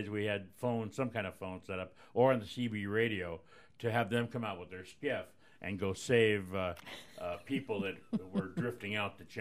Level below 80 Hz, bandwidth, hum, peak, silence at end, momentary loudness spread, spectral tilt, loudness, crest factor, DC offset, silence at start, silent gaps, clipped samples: -70 dBFS; 15.5 kHz; none; -14 dBFS; 0 s; 14 LU; -6 dB/octave; -36 LUFS; 22 dB; under 0.1%; 0 s; none; under 0.1%